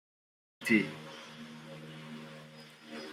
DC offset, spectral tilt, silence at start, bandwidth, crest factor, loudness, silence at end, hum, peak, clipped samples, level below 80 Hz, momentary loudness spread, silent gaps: under 0.1%; -5 dB/octave; 0.6 s; 16 kHz; 24 dB; -33 LUFS; 0 s; none; -14 dBFS; under 0.1%; -82 dBFS; 21 LU; none